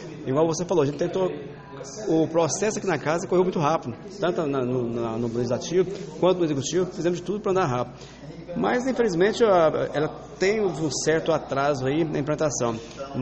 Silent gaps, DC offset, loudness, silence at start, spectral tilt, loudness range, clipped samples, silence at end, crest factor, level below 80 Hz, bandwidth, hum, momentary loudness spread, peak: none; under 0.1%; -24 LUFS; 0 s; -5.5 dB/octave; 3 LU; under 0.1%; 0 s; 16 dB; -54 dBFS; 8.4 kHz; none; 9 LU; -8 dBFS